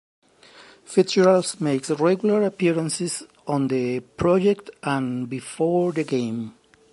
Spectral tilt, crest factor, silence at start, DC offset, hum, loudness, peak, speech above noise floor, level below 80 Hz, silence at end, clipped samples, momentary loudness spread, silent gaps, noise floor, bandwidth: -5.5 dB/octave; 18 dB; 0.6 s; under 0.1%; none; -22 LUFS; -4 dBFS; 28 dB; -56 dBFS; 0.4 s; under 0.1%; 11 LU; none; -50 dBFS; 11.5 kHz